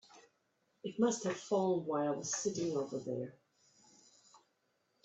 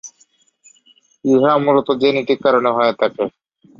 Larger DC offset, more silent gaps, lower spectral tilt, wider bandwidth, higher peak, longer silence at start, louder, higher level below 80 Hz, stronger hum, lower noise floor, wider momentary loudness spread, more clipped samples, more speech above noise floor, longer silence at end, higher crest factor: neither; neither; about the same, -4.5 dB/octave vs -5.5 dB/octave; first, 8.4 kHz vs 7.4 kHz; second, -18 dBFS vs -2 dBFS; about the same, 0.15 s vs 0.05 s; second, -36 LUFS vs -16 LUFS; second, -80 dBFS vs -64 dBFS; neither; first, -79 dBFS vs -57 dBFS; about the same, 10 LU vs 10 LU; neither; about the same, 43 dB vs 42 dB; first, 0.7 s vs 0.5 s; about the same, 20 dB vs 16 dB